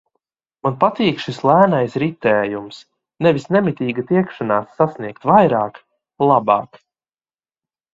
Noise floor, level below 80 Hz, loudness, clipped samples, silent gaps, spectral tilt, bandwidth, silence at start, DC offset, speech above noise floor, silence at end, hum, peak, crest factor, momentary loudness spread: under -90 dBFS; -58 dBFS; -17 LUFS; under 0.1%; none; -7.5 dB/octave; 7.8 kHz; 0.65 s; under 0.1%; over 73 dB; 1.3 s; none; 0 dBFS; 18 dB; 11 LU